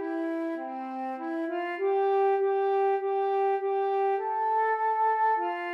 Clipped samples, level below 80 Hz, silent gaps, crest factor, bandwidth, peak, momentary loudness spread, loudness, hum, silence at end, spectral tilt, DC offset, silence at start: under 0.1%; under -90 dBFS; none; 10 dB; 5.4 kHz; -18 dBFS; 9 LU; -28 LUFS; none; 0 s; -4.5 dB/octave; under 0.1%; 0 s